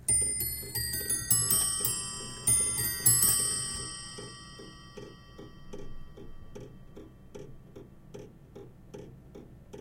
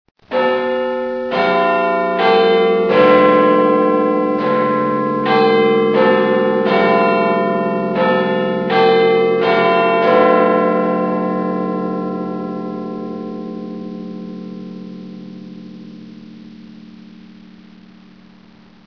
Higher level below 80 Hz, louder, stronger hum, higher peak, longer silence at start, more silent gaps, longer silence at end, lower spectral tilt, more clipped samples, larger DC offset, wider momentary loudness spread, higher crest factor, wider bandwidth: first, -50 dBFS vs -60 dBFS; second, -26 LUFS vs -15 LUFS; neither; second, -8 dBFS vs 0 dBFS; second, 0 s vs 0.3 s; neither; second, 0 s vs 2.1 s; second, -1.5 dB/octave vs -8 dB/octave; neither; neither; first, 26 LU vs 18 LU; first, 24 dB vs 16 dB; first, 16.5 kHz vs 5.4 kHz